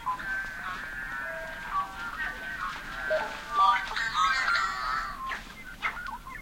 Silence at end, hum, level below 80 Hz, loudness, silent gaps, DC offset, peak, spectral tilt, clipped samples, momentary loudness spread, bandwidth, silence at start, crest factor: 0 s; none; -50 dBFS; -30 LUFS; none; under 0.1%; -12 dBFS; -2 dB/octave; under 0.1%; 12 LU; 16.5 kHz; 0 s; 20 dB